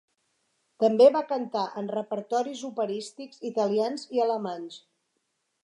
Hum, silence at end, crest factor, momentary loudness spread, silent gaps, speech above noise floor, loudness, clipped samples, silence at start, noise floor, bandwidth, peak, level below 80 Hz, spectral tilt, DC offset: none; 0.85 s; 20 dB; 16 LU; none; 51 dB; -26 LUFS; under 0.1%; 0.8 s; -77 dBFS; 11 kHz; -8 dBFS; -86 dBFS; -5.5 dB/octave; under 0.1%